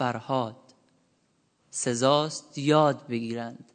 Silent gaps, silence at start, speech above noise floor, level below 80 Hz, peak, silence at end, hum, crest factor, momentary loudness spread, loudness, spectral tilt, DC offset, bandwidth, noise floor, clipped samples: none; 0 s; 43 dB; -76 dBFS; -6 dBFS; 0.2 s; none; 20 dB; 13 LU; -27 LUFS; -4.5 dB/octave; under 0.1%; 9.4 kHz; -70 dBFS; under 0.1%